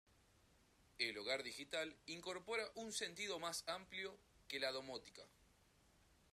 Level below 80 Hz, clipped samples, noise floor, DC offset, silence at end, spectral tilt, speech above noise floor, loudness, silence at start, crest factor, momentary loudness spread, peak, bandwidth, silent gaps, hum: -78 dBFS; under 0.1%; -74 dBFS; under 0.1%; 0.9 s; -1.5 dB/octave; 26 dB; -46 LUFS; 1 s; 24 dB; 9 LU; -24 dBFS; 14 kHz; none; none